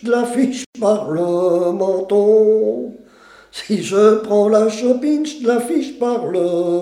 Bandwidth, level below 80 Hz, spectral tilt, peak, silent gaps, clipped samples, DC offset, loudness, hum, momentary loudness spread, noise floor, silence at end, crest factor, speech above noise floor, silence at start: 13 kHz; -64 dBFS; -5.5 dB/octave; -2 dBFS; 0.66-0.73 s; under 0.1%; under 0.1%; -16 LUFS; none; 8 LU; -45 dBFS; 0 s; 14 dB; 30 dB; 0 s